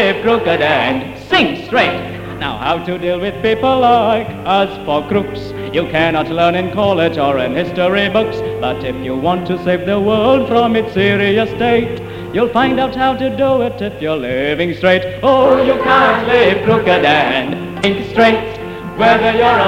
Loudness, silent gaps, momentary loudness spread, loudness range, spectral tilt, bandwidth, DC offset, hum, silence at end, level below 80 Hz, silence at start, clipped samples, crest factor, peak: -14 LUFS; none; 8 LU; 4 LU; -6.5 dB/octave; 16 kHz; under 0.1%; none; 0 s; -40 dBFS; 0 s; under 0.1%; 14 dB; 0 dBFS